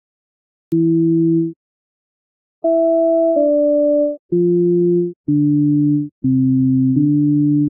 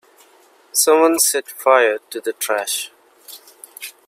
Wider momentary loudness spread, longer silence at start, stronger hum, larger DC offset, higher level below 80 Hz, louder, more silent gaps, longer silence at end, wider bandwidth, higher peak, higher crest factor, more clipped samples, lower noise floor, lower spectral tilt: second, 5 LU vs 21 LU; about the same, 0.7 s vs 0.75 s; neither; neither; first, -60 dBFS vs -76 dBFS; about the same, -16 LUFS vs -17 LUFS; first, 1.56-2.62 s, 4.19-4.29 s, 5.16-5.24 s, 6.12-6.22 s vs none; second, 0 s vs 0.15 s; second, 1.4 kHz vs 16 kHz; second, -6 dBFS vs 0 dBFS; second, 10 dB vs 20 dB; neither; first, under -90 dBFS vs -52 dBFS; first, -15 dB/octave vs 0.5 dB/octave